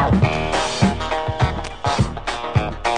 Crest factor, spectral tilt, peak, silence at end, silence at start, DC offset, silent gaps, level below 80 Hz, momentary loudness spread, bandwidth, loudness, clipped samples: 18 dB; -5.5 dB/octave; -2 dBFS; 0 s; 0 s; 0.9%; none; -32 dBFS; 5 LU; 10 kHz; -21 LUFS; under 0.1%